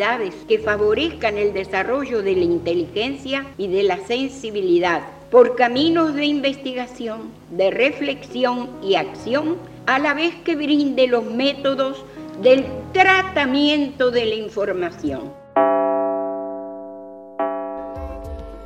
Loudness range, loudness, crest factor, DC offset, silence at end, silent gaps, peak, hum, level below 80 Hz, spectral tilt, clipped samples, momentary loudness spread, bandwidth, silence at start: 4 LU; -20 LUFS; 20 dB; under 0.1%; 0 s; none; 0 dBFS; none; -46 dBFS; -5 dB/octave; under 0.1%; 14 LU; 10 kHz; 0 s